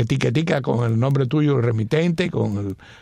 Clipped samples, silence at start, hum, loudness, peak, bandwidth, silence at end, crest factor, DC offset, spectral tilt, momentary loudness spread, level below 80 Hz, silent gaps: under 0.1%; 0 s; none; -20 LUFS; -6 dBFS; 10.5 kHz; 0.05 s; 14 dB; under 0.1%; -7.5 dB/octave; 5 LU; -52 dBFS; none